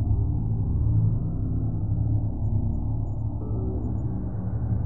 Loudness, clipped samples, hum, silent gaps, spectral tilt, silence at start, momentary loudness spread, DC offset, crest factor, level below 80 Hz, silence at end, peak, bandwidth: -27 LUFS; under 0.1%; none; none; -14.5 dB/octave; 0 s; 6 LU; 2%; 12 dB; -32 dBFS; 0 s; -12 dBFS; 1.6 kHz